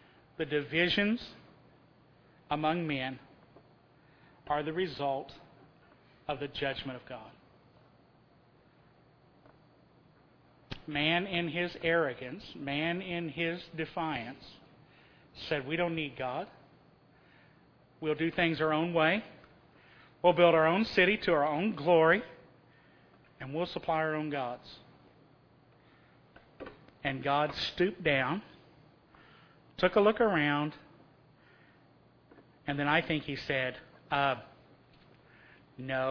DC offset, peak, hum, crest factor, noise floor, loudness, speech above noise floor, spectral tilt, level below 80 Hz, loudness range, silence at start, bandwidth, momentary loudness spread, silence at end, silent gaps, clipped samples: under 0.1%; -10 dBFS; none; 24 dB; -63 dBFS; -31 LUFS; 33 dB; -7 dB/octave; -62 dBFS; 11 LU; 0.4 s; 5.4 kHz; 21 LU; 0 s; none; under 0.1%